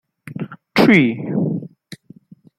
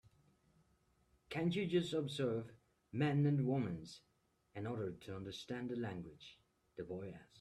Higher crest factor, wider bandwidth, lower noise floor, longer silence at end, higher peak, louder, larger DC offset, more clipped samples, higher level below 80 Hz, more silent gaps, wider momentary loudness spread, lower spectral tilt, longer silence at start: about the same, 18 dB vs 18 dB; first, 15.5 kHz vs 12 kHz; second, -46 dBFS vs -76 dBFS; first, 0.65 s vs 0 s; first, -2 dBFS vs -24 dBFS; first, -16 LUFS vs -41 LUFS; neither; neither; first, -58 dBFS vs -74 dBFS; neither; about the same, 20 LU vs 20 LU; about the same, -7 dB/octave vs -7 dB/octave; second, 0.25 s vs 1.3 s